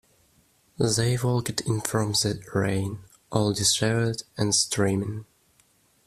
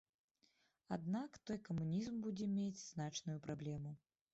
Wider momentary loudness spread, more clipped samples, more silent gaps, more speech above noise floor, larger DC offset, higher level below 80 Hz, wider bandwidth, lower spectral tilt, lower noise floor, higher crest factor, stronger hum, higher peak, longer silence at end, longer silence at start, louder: about the same, 8 LU vs 7 LU; neither; neither; about the same, 38 dB vs 35 dB; neither; first, -56 dBFS vs -74 dBFS; first, 15 kHz vs 8 kHz; second, -4 dB/octave vs -7 dB/octave; second, -63 dBFS vs -80 dBFS; first, 20 dB vs 14 dB; neither; first, -6 dBFS vs -32 dBFS; first, 0.85 s vs 0.35 s; about the same, 0.8 s vs 0.9 s; first, -25 LUFS vs -45 LUFS